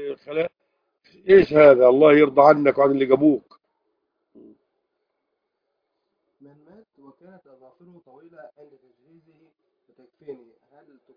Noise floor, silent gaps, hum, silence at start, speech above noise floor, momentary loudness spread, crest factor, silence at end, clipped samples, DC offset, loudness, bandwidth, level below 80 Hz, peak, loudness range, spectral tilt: -78 dBFS; none; none; 0 s; 61 dB; 15 LU; 22 dB; 0.8 s; under 0.1%; under 0.1%; -16 LUFS; 5.2 kHz; -58 dBFS; 0 dBFS; 10 LU; -8.5 dB/octave